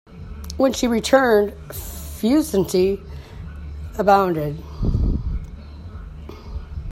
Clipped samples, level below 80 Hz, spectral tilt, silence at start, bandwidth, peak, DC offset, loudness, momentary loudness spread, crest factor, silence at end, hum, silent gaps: under 0.1%; -32 dBFS; -5.5 dB/octave; 0.1 s; 16.5 kHz; 0 dBFS; under 0.1%; -20 LUFS; 21 LU; 20 dB; 0 s; none; none